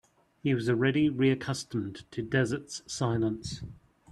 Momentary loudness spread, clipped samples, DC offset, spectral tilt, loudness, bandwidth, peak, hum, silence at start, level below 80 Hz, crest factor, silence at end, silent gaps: 13 LU; under 0.1%; under 0.1%; -6 dB/octave; -30 LUFS; 12 kHz; -12 dBFS; none; 0.45 s; -58 dBFS; 18 dB; 0 s; none